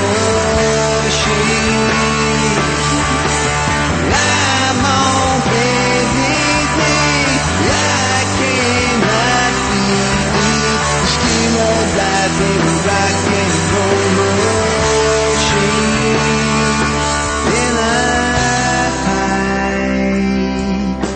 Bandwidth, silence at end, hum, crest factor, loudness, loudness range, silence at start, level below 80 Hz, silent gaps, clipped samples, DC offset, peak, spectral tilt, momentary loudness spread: 8.8 kHz; 0 s; none; 14 dB; -13 LUFS; 1 LU; 0 s; -28 dBFS; none; under 0.1%; under 0.1%; 0 dBFS; -3.5 dB/octave; 3 LU